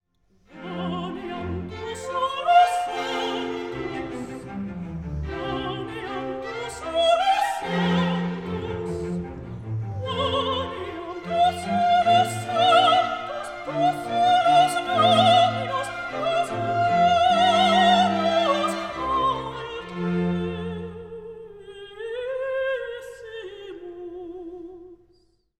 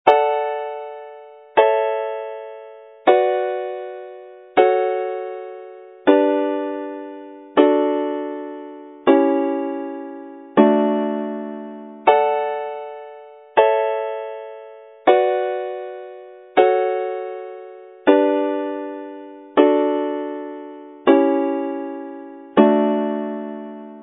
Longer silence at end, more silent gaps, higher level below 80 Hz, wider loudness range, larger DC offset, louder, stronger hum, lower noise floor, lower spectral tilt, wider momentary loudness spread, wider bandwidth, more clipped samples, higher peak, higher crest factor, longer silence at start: first, 0.65 s vs 0 s; neither; first, -50 dBFS vs -74 dBFS; first, 11 LU vs 1 LU; neither; second, -23 LUFS vs -19 LUFS; neither; first, -62 dBFS vs -41 dBFS; second, -5 dB/octave vs -8.5 dB/octave; about the same, 20 LU vs 20 LU; first, 13.5 kHz vs 4 kHz; neither; second, -6 dBFS vs 0 dBFS; about the same, 18 dB vs 20 dB; first, 0.5 s vs 0.05 s